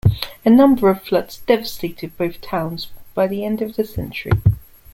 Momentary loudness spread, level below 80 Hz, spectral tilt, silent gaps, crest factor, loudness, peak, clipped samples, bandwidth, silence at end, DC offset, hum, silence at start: 15 LU; -38 dBFS; -7.5 dB/octave; none; 16 dB; -19 LUFS; -2 dBFS; under 0.1%; 16.5 kHz; 0.35 s; under 0.1%; none; 0.05 s